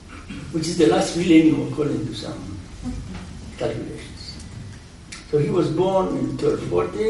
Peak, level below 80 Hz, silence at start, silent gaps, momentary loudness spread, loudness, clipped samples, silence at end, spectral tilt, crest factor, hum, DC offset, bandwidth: -4 dBFS; -42 dBFS; 0 s; none; 20 LU; -21 LUFS; under 0.1%; 0 s; -6 dB/octave; 20 dB; none; under 0.1%; 11.5 kHz